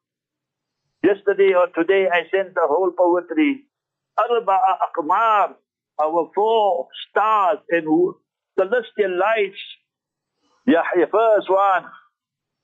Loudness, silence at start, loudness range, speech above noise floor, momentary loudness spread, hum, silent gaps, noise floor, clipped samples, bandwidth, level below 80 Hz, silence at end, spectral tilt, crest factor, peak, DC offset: -19 LUFS; 1.05 s; 2 LU; 66 dB; 8 LU; none; none; -85 dBFS; under 0.1%; 7.4 kHz; -76 dBFS; 0.75 s; -6.5 dB/octave; 14 dB; -6 dBFS; under 0.1%